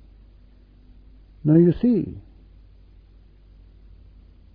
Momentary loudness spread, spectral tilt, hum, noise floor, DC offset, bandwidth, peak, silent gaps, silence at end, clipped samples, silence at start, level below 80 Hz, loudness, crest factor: 18 LU; -13 dB/octave; none; -51 dBFS; under 0.1%; 4.7 kHz; -6 dBFS; none; 2.35 s; under 0.1%; 1.45 s; -48 dBFS; -20 LUFS; 20 dB